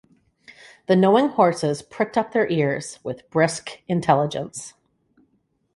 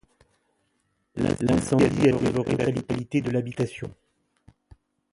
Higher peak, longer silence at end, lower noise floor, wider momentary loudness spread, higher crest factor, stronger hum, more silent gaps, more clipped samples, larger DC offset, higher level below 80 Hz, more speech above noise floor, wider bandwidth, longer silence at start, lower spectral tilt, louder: first, -4 dBFS vs -8 dBFS; second, 1.05 s vs 1.2 s; second, -68 dBFS vs -72 dBFS; first, 16 LU vs 10 LU; about the same, 20 dB vs 18 dB; neither; neither; neither; neither; second, -62 dBFS vs -48 dBFS; about the same, 47 dB vs 49 dB; about the same, 11.5 kHz vs 11.5 kHz; second, 0.9 s vs 1.15 s; second, -5.5 dB/octave vs -7 dB/octave; first, -21 LUFS vs -24 LUFS